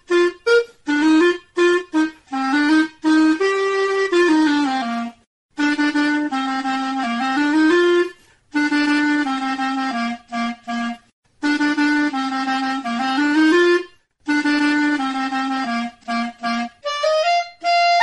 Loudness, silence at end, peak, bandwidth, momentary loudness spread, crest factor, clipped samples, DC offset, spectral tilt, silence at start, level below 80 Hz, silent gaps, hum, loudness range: -19 LUFS; 0 s; -2 dBFS; 10 kHz; 10 LU; 16 dB; under 0.1%; under 0.1%; -3 dB/octave; 0.1 s; -62 dBFS; 5.27-5.49 s, 11.13-11.23 s; none; 4 LU